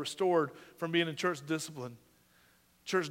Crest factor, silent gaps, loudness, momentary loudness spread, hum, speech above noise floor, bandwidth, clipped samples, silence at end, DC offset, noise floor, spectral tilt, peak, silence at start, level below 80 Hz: 20 dB; none; -33 LUFS; 15 LU; none; 33 dB; 16 kHz; under 0.1%; 0 s; under 0.1%; -66 dBFS; -4.5 dB/octave; -14 dBFS; 0 s; -80 dBFS